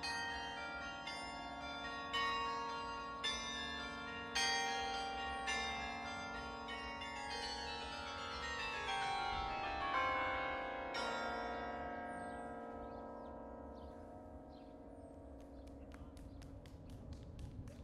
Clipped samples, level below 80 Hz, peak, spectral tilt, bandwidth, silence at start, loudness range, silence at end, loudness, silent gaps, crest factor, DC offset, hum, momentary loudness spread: under 0.1%; -60 dBFS; -24 dBFS; -2.5 dB/octave; 13 kHz; 0 s; 14 LU; 0 s; -42 LUFS; none; 20 dB; under 0.1%; none; 17 LU